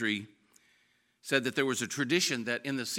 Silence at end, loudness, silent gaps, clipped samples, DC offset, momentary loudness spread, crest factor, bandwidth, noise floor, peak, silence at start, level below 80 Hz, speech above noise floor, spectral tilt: 0 s; -30 LUFS; none; under 0.1%; under 0.1%; 10 LU; 22 dB; 17 kHz; -71 dBFS; -12 dBFS; 0 s; -82 dBFS; 39 dB; -3 dB/octave